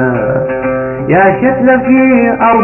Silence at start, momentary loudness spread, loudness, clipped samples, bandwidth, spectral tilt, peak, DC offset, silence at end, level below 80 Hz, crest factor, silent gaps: 0 s; 7 LU; -10 LUFS; under 0.1%; 3 kHz; -10.5 dB/octave; 0 dBFS; under 0.1%; 0 s; -38 dBFS; 10 dB; none